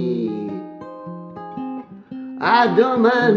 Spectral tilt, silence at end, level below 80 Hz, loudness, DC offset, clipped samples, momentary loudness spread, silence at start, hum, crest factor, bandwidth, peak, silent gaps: -7 dB/octave; 0 s; -68 dBFS; -18 LUFS; under 0.1%; under 0.1%; 19 LU; 0 s; none; 18 dB; 6.8 kHz; -2 dBFS; none